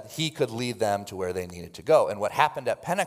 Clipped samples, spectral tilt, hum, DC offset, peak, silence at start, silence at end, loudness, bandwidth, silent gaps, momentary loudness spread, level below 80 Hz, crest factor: under 0.1%; -4.5 dB/octave; none; under 0.1%; -4 dBFS; 0 s; 0 s; -26 LUFS; 16 kHz; none; 11 LU; -66 dBFS; 22 dB